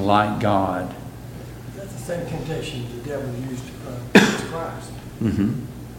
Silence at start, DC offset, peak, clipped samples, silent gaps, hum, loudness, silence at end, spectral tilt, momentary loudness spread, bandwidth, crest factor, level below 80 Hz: 0 s; under 0.1%; 0 dBFS; under 0.1%; none; none; -23 LUFS; 0 s; -5.5 dB/octave; 20 LU; 17 kHz; 22 dB; -44 dBFS